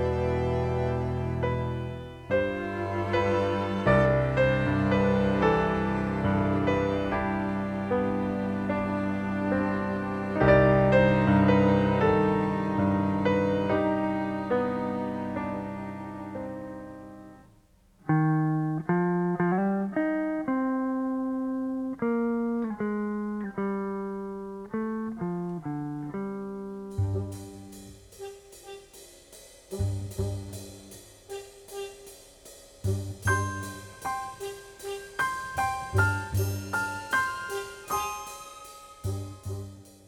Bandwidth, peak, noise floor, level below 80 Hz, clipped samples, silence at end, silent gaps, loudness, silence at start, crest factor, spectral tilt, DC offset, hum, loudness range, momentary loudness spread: 17.5 kHz; -8 dBFS; -60 dBFS; -46 dBFS; under 0.1%; 0.15 s; none; -28 LUFS; 0 s; 20 dB; -7 dB/octave; under 0.1%; none; 14 LU; 19 LU